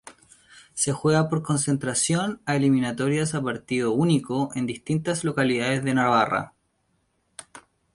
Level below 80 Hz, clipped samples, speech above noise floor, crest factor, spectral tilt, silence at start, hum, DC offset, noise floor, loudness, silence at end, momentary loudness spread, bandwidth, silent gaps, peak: -60 dBFS; under 0.1%; 47 dB; 18 dB; -5 dB/octave; 0.05 s; none; under 0.1%; -70 dBFS; -24 LUFS; 0.35 s; 8 LU; 11.5 kHz; none; -6 dBFS